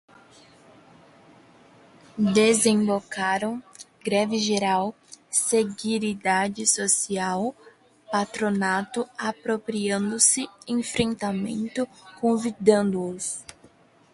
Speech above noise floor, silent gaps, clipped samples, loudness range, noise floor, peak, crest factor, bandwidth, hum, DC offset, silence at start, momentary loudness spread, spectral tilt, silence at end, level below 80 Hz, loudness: 32 dB; none; under 0.1%; 2 LU; -56 dBFS; -4 dBFS; 22 dB; 11.5 kHz; none; under 0.1%; 2.15 s; 12 LU; -3.5 dB/octave; 0.7 s; -62 dBFS; -24 LUFS